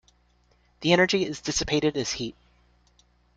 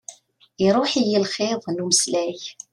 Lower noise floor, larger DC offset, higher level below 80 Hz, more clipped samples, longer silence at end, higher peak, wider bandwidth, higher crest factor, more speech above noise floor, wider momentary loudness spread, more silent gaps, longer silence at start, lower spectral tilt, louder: first, -64 dBFS vs -45 dBFS; neither; first, -52 dBFS vs -64 dBFS; neither; first, 1.05 s vs 0.2 s; about the same, -6 dBFS vs -4 dBFS; second, 9.4 kHz vs 13 kHz; about the same, 22 dB vs 20 dB; first, 39 dB vs 23 dB; about the same, 10 LU vs 11 LU; neither; first, 0.8 s vs 0.1 s; about the same, -3.5 dB/octave vs -3 dB/octave; second, -25 LUFS vs -21 LUFS